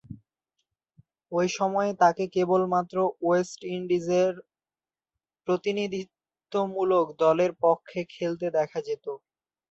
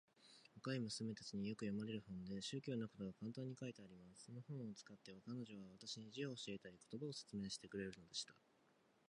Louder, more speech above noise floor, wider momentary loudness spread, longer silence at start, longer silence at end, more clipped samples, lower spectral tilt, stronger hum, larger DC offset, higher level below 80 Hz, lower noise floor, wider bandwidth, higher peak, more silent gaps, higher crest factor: first, -26 LUFS vs -50 LUFS; first, over 64 dB vs 27 dB; about the same, 12 LU vs 12 LU; about the same, 0.1 s vs 0.15 s; second, 0.55 s vs 0.75 s; neither; about the same, -6 dB/octave vs -5 dB/octave; neither; neither; first, -70 dBFS vs -80 dBFS; first, under -90 dBFS vs -77 dBFS; second, 8 kHz vs 11 kHz; first, -8 dBFS vs -32 dBFS; neither; about the same, 18 dB vs 18 dB